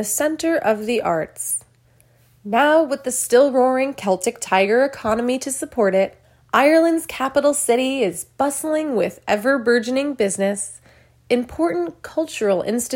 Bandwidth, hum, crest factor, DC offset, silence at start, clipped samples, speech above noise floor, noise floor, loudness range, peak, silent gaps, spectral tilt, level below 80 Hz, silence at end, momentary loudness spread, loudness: 16.5 kHz; none; 18 dB; under 0.1%; 0 s; under 0.1%; 37 dB; -56 dBFS; 3 LU; -2 dBFS; none; -3.5 dB/octave; -56 dBFS; 0 s; 8 LU; -19 LUFS